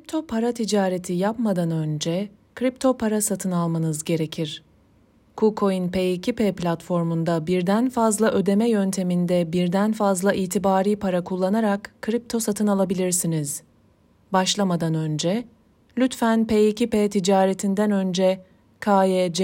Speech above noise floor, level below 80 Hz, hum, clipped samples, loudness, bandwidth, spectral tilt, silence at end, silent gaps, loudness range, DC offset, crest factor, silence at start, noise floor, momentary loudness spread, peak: 37 dB; -58 dBFS; none; under 0.1%; -22 LUFS; 16.5 kHz; -5.5 dB/octave; 0 s; none; 4 LU; under 0.1%; 16 dB; 0.1 s; -58 dBFS; 7 LU; -6 dBFS